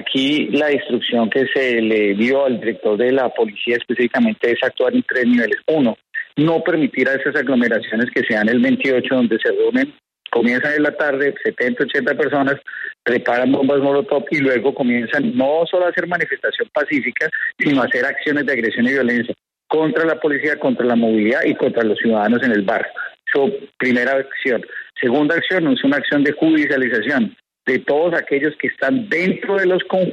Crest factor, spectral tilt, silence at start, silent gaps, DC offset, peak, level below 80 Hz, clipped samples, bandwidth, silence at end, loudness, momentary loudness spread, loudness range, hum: 14 dB; -6.5 dB/octave; 0 s; none; under 0.1%; -4 dBFS; -64 dBFS; under 0.1%; 7.8 kHz; 0 s; -17 LUFS; 5 LU; 1 LU; none